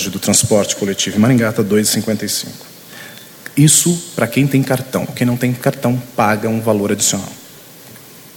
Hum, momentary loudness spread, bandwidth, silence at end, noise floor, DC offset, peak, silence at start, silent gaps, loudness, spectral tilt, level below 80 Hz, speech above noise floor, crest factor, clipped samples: none; 20 LU; 18 kHz; 0.05 s; -38 dBFS; under 0.1%; 0 dBFS; 0 s; none; -15 LUFS; -4 dB/octave; -52 dBFS; 23 dB; 16 dB; under 0.1%